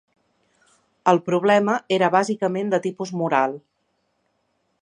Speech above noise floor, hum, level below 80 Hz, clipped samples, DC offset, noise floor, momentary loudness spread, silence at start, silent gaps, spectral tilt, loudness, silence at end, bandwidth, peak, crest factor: 51 dB; none; -72 dBFS; under 0.1%; under 0.1%; -71 dBFS; 8 LU; 1.05 s; none; -5.5 dB/octave; -21 LUFS; 1.25 s; 10.5 kHz; -2 dBFS; 20 dB